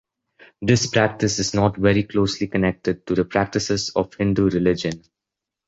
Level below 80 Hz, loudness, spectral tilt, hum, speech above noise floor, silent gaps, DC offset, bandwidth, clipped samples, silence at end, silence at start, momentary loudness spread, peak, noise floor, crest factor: -44 dBFS; -21 LUFS; -5 dB/octave; none; 65 dB; none; under 0.1%; 8 kHz; under 0.1%; 0.7 s; 0.6 s; 6 LU; -2 dBFS; -85 dBFS; 18 dB